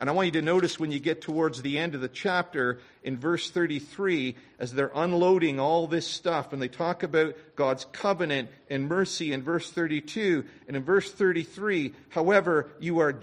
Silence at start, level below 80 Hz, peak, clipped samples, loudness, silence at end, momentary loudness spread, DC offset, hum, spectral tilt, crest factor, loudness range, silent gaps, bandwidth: 0 s; -68 dBFS; -10 dBFS; under 0.1%; -28 LUFS; 0 s; 8 LU; under 0.1%; none; -5.5 dB/octave; 18 dB; 2 LU; none; 10.5 kHz